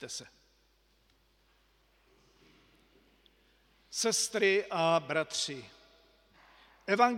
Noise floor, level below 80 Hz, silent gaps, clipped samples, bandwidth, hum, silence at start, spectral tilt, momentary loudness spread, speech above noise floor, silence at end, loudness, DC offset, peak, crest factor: -69 dBFS; -72 dBFS; none; under 0.1%; 16.5 kHz; none; 0 s; -2.5 dB/octave; 17 LU; 39 dB; 0 s; -31 LUFS; under 0.1%; -10 dBFS; 24 dB